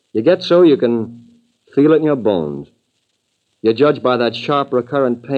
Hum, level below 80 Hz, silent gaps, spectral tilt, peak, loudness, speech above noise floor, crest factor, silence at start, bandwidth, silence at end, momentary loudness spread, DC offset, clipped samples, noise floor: none; -62 dBFS; none; -8 dB/octave; -2 dBFS; -15 LUFS; 53 dB; 14 dB; 0.15 s; 6.8 kHz; 0 s; 11 LU; under 0.1%; under 0.1%; -68 dBFS